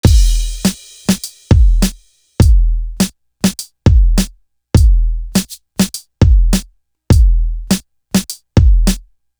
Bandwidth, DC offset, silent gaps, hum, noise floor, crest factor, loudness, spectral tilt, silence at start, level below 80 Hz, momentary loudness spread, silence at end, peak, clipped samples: over 20 kHz; under 0.1%; none; none; -40 dBFS; 12 dB; -15 LUFS; -5.5 dB/octave; 0.05 s; -14 dBFS; 8 LU; 0.4 s; 0 dBFS; under 0.1%